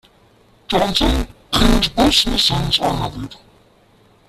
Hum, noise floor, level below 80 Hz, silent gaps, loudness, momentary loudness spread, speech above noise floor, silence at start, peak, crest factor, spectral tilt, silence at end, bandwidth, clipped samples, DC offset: none; -52 dBFS; -26 dBFS; none; -16 LUFS; 11 LU; 36 dB; 0.7 s; -2 dBFS; 18 dB; -4 dB/octave; 0.95 s; 15 kHz; under 0.1%; under 0.1%